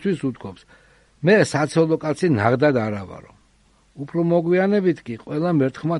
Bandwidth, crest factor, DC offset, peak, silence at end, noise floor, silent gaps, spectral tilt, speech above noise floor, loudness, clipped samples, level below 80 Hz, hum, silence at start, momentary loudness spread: 11.5 kHz; 20 dB; under 0.1%; -2 dBFS; 0 s; -58 dBFS; none; -7 dB/octave; 38 dB; -20 LUFS; under 0.1%; -58 dBFS; none; 0 s; 14 LU